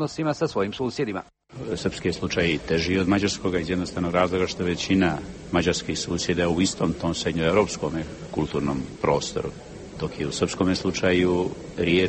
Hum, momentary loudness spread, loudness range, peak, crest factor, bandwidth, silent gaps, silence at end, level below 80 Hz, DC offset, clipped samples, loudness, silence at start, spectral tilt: none; 10 LU; 3 LU; -6 dBFS; 18 dB; 8.8 kHz; none; 0 s; -46 dBFS; under 0.1%; under 0.1%; -25 LUFS; 0 s; -5 dB/octave